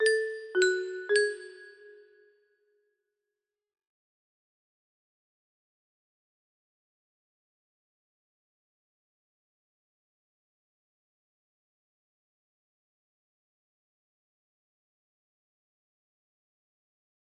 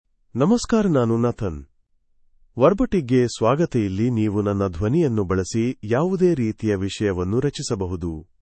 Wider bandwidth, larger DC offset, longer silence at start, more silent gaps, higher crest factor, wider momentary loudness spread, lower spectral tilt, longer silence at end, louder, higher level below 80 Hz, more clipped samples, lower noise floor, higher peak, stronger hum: about the same, 9.4 kHz vs 8.8 kHz; neither; second, 0 s vs 0.35 s; neither; first, 28 dB vs 18 dB; first, 19 LU vs 8 LU; second, -0.5 dB/octave vs -7 dB/octave; first, 15.45 s vs 0.2 s; second, -28 LUFS vs -21 LUFS; second, -86 dBFS vs -44 dBFS; neither; first, -90 dBFS vs -62 dBFS; second, -12 dBFS vs -4 dBFS; neither